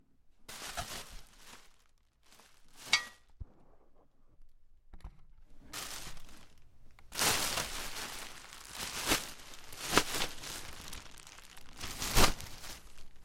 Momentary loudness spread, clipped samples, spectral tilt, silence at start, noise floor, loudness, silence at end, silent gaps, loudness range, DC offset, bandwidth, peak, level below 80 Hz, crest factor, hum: 25 LU; under 0.1%; -1.5 dB/octave; 0.25 s; -66 dBFS; -35 LUFS; 0 s; none; 15 LU; under 0.1%; 16.5 kHz; -4 dBFS; -48 dBFS; 34 dB; none